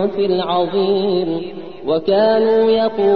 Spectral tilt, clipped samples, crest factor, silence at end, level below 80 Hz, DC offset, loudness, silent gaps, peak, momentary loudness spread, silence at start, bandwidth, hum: -9 dB/octave; under 0.1%; 12 dB; 0 s; -54 dBFS; 1%; -16 LUFS; none; -4 dBFS; 10 LU; 0 s; 5 kHz; none